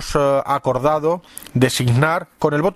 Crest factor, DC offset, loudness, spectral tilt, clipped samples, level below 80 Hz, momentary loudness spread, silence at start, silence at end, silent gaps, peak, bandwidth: 18 dB; under 0.1%; -18 LUFS; -5.5 dB/octave; under 0.1%; -42 dBFS; 5 LU; 0 s; 0 s; none; 0 dBFS; 15.5 kHz